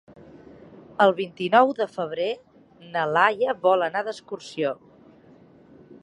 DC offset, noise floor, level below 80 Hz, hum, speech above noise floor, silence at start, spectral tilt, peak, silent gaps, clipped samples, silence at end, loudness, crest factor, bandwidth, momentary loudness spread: under 0.1%; -52 dBFS; -70 dBFS; none; 29 dB; 0.75 s; -5.5 dB/octave; -4 dBFS; none; under 0.1%; 1.3 s; -23 LUFS; 22 dB; 10.5 kHz; 16 LU